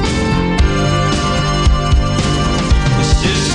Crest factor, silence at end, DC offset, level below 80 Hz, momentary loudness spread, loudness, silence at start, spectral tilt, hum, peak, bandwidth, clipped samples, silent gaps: 12 dB; 0 s; under 0.1%; -18 dBFS; 2 LU; -14 LUFS; 0 s; -5 dB/octave; none; 0 dBFS; 11 kHz; under 0.1%; none